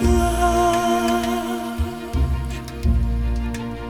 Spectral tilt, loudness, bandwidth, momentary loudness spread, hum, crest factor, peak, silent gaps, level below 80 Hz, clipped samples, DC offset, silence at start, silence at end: -6 dB/octave; -22 LUFS; 17.5 kHz; 8 LU; none; 14 dB; -6 dBFS; none; -24 dBFS; under 0.1%; under 0.1%; 0 s; 0 s